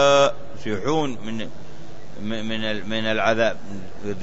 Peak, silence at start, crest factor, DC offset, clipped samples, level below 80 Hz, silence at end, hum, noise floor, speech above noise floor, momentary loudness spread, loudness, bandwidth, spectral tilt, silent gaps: -4 dBFS; 0 s; 18 dB; 5%; under 0.1%; -52 dBFS; 0 s; none; -42 dBFS; 19 dB; 19 LU; -24 LUFS; 8 kHz; -4.5 dB/octave; none